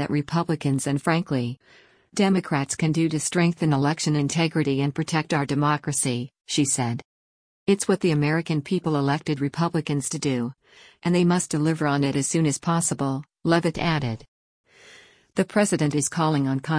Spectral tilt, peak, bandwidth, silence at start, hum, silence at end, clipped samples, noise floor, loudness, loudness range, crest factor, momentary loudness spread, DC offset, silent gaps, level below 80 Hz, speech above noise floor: -5 dB/octave; -6 dBFS; 10.5 kHz; 0 s; none; 0 s; under 0.1%; -52 dBFS; -24 LUFS; 2 LU; 16 dB; 6 LU; under 0.1%; 7.05-7.66 s, 14.28-14.64 s; -58 dBFS; 28 dB